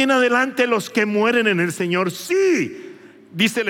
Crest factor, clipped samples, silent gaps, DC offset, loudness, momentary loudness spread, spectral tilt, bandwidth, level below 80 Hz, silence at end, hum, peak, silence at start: 16 dB; under 0.1%; none; under 0.1%; -19 LUFS; 5 LU; -4.5 dB/octave; 17 kHz; -80 dBFS; 0 s; none; -4 dBFS; 0 s